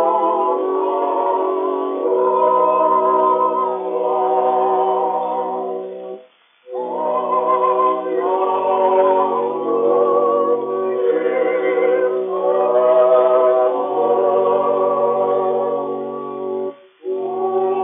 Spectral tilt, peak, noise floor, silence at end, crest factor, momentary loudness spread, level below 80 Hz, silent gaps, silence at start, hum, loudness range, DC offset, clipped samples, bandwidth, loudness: -4.5 dB/octave; -4 dBFS; -48 dBFS; 0 s; 14 dB; 10 LU; under -90 dBFS; none; 0 s; none; 5 LU; under 0.1%; under 0.1%; 3.7 kHz; -17 LUFS